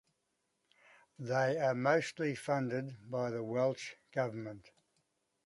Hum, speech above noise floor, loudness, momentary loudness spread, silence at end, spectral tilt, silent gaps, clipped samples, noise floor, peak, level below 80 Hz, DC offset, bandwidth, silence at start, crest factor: none; 47 dB; -35 LUFS; 13 LU; 0.85 s; -6 dB/octave; none; under 0.1%; -82 dBFS; -16 dBFS; -78 dBFS; under 0.1%; 11.5 kHz; 1.2 s; 20 dB